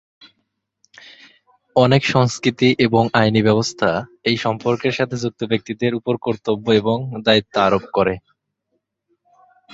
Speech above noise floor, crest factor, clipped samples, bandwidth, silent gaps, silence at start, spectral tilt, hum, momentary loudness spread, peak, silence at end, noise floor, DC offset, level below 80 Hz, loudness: 55 dB; 18 dB; under 0.1%; 8 kHz; none; 1.05 s; -5.5 dB/octave; none; 7 LU; -2 dBFS; 1.55 s; -73 dBFS; under 0.1%; -52 dBFS; -18 LUFS